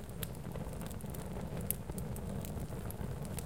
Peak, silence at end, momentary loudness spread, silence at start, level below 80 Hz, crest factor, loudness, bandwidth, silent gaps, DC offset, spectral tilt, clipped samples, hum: -12 dBFS; 0 s; 5 LU; 0 s; -48 dBFS; 28 dB; -42 LUFS; 17 kHz; none; 0.3%; -5.5 dB/octave; under 0.1%; none